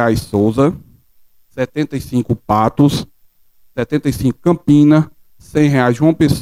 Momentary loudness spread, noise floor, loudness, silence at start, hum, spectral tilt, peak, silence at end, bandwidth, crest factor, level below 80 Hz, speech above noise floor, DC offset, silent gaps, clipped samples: 13 LU; -49 dBFS; -15 LUFS; 0 s; none; -7.5 dB/octave; 0 dBFS; 0 s; 15.5 kHz; 14 dB; -40 dBFS; 36 dB; under 0.1%; none; under 0.1%